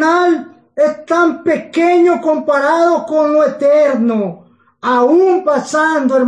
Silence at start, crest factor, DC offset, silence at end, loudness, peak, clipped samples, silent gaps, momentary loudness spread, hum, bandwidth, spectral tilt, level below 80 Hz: 0 s; 10 dB; under 0.1%; 0 s; -13 LUFS; -4 dBFS; under 0.1%; none; 6 LU; none; 10 kHz; -5 dB/octave; -68 dBFS